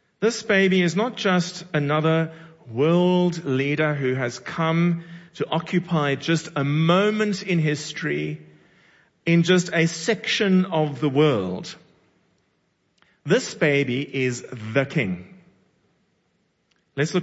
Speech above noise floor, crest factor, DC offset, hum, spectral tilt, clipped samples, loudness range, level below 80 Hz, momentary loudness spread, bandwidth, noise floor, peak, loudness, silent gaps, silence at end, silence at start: 47 dB; 18 dB; under 0.1%; none; -5.5 dB/octave; under 0.1%; 4 LU; -66 dBFS; 11 LU; 8 kHz; -69 dBFS; -4 dBFS; -22 LUFS; none; 0 s; 0.2 s